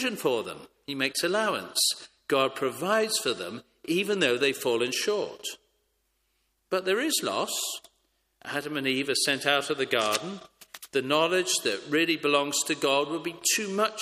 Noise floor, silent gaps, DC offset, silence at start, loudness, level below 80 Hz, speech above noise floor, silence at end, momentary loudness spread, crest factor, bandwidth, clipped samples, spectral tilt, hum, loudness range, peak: -74 dBFS; none; under 0.1%; 0 s; -27 LUFS; -74 dBFS; 47 dB; 0 s; 13 LU; 22 dB; 15.5 kHz; under 0.1%; -2 dB/octave; none; 4 LU; -6 dBFS